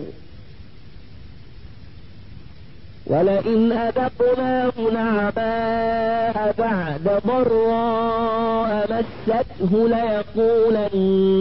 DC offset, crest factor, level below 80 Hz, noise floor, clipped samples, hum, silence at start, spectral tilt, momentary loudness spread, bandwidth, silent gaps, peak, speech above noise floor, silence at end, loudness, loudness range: 1%; 12 dB; -46 dBFS; -43 dBFS; under 0.1%; none; 0 s; -11.5 dB/octave; 5 LU; 5.8 kHz; none; -8 dBFS; 24 dB; 0 s; -20 LUFS; 4 LU